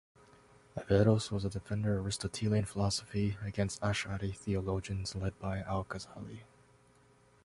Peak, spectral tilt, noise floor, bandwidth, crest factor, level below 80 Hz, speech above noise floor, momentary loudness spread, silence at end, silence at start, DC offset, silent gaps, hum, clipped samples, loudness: -14 dBFS; -6 dB/octave; -65 dBFS; 11.5 kHz; 22 dB; -52 dBFS; 31 dB; 14 LU; 1 s; 0.75 s; under 0.1%; none; none; under 0.1%; -34 LUFS